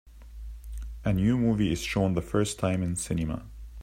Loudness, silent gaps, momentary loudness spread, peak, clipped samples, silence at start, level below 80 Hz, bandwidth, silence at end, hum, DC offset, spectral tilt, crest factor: -28 LUFS; none; 19 LU; -10 dBFS; under 0.1%; 0.05 s; -42 dBFS; 16 kHz; 0 s; none; under 0.1%; -6 dB/octave; 18 dB